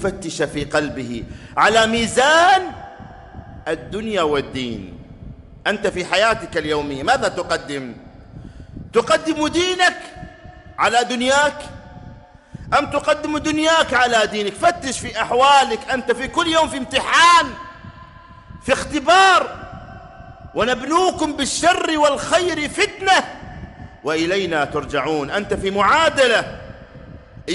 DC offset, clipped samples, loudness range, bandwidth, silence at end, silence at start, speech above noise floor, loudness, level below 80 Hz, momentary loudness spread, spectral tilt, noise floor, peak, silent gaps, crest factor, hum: under 0.1%; under 0.1%; 5 LU; 11.5 kHz; 0 s; 0 s; 24 dB; -17 LUFS; -44 dBFS; 22 LU; -3 dB/octave; -42 dBFS; -2 dBFS; none; 18 dB; none